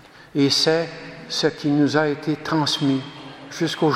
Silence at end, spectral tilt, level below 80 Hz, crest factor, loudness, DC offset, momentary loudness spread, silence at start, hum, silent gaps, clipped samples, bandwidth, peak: 0 s; -4.5 dB/octave; -62 dBFS; 18 dB; -21 LUFS; under 0.1%; 15 LU; 0.2 s; none; none; under 0.1%; 14.5 kHz; -2 dBFS